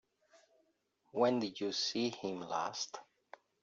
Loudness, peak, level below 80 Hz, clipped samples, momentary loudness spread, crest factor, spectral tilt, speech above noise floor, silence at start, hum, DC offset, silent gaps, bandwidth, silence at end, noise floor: -37 LUFS; -18 dBFS; -84 dBFS; under 0.1%; 11 LU; 20 dB; -3 dB/octave; 41 dB; 1.15 s; none; under 0.1%; none; 7.6 kHz; 0.6 s; -78 dBFS